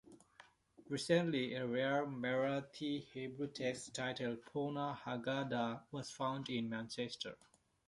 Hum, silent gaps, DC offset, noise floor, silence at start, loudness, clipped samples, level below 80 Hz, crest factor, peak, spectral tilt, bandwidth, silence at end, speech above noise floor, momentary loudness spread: none; none; under 0.1%; -66 dBFS; 0.05 s; -41 LUFS; under 0.1%; -78 dBFS; 22 dB; -20 dBFS; -5 dB/octave; 11.5 kHz; 0.5 s; 26 dB; 9 LU